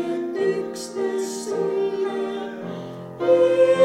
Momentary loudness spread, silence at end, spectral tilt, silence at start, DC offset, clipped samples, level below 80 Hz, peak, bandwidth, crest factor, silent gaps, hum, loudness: 15 LU; 0 s; -5 dB/octave; 0 s; under 0.1%; under 0.1%; -74 dBFS; -6 dBFS; 13 kHz; 16 dB; none; none; -23 LUFS